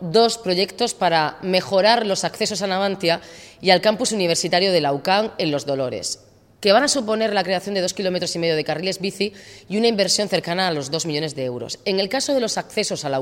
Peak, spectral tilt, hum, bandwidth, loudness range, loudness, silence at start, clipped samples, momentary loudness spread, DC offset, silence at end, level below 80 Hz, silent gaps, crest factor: -2 dBFS; -3.5 dB/octave; none; 16.5 kHz; 2 LU; -20 LUFS; 0 s; under 0.1%; 8 LU; under 0.1%; 0 s; -62 dBFS; none; 20 dB